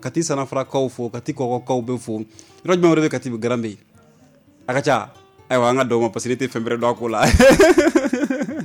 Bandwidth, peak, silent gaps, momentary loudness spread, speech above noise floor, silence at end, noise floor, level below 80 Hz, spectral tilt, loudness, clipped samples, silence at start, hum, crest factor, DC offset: 16.5 kHz; -4 dBFS; none; 15 LU; 34 dB; 0 s; -52 dBFS; -36 dBFS; -5 dB/octave; -19 LUFS; under 0.1%; 0 s; none; 14 dB; under 0.1%